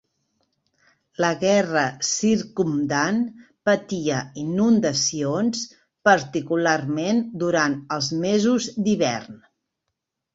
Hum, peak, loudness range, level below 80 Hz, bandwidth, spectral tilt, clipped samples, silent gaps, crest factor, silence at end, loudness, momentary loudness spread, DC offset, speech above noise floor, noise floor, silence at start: none; -4 dBFS; 2 LU; -62 dBFS; 8 kHz; -4 dB/octave; under 0.1%; none; 20 dB; 1 s; -22 LUFS; 7 LU; under 0.1%; 59 dB; -81 dBFS; 1.2 s